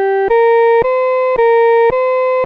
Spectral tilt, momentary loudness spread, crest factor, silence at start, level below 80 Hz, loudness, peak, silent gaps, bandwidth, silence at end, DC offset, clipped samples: -6.5 dB/octave; 4 LU; 8 dB; 0 s; -44 dBFS; -11 LUFS; -4 dBFS; none; 4.9 kHz; 0 s; under 0.1%; under 0.1%